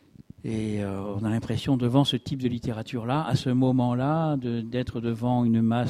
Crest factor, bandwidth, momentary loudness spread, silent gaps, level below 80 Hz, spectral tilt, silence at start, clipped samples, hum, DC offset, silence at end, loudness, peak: 18 dB; 13 kHz; 8 LU; none; -52 dBFS; -7.5 dB/octave; 0.45 s; under 0.1%; none; under 0.1%; 0 s; -26 LUFS; -8 dBFS